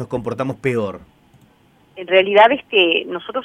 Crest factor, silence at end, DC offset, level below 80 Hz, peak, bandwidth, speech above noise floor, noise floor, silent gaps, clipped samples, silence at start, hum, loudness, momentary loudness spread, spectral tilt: 18 dB; 0 s; under 0.1%; -56 dBFS; 0 dBFS; 10.5 kHz; 37 dB; -54 dBFS; none; under 0.1%; 0 s; none; -16 LUFS; 13 LU; -6 dB/octave